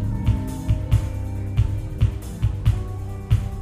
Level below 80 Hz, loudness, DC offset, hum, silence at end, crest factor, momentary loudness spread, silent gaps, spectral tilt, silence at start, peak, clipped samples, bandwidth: -26 dBFS; -24 LUFS; under 0.1%; none; 0 s; 16 dB; 6 LU; none; -7.5 dB/octave; 0 s; -6 dBFS; under 0.1%; 14.5 kHz